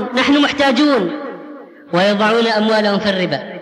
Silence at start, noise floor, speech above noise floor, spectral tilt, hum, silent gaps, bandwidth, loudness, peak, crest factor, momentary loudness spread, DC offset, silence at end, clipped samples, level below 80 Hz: 0 s; -35 dBFS; 21 dB; -5 dB/octave; none; none; 11 kHz; -15 LUFS; -2 dBFS; 12 dB; 14 LU; under 0.1%; 0 s; under 0.1%; -54 dBFS